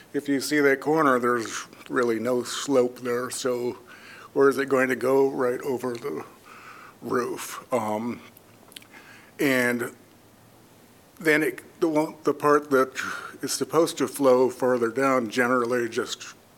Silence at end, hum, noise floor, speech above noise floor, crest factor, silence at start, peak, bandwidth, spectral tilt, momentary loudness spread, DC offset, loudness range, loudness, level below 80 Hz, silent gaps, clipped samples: 0.25 s; none; -54 dBFS; 30 dB; 20 dB; 0.15 s; -6 dBFS; 18 kHz; -4 dB/octave; 14 LU; under 0.1%; 7 LU; -25 LUFS; -74 dBFS; none; under 0.1%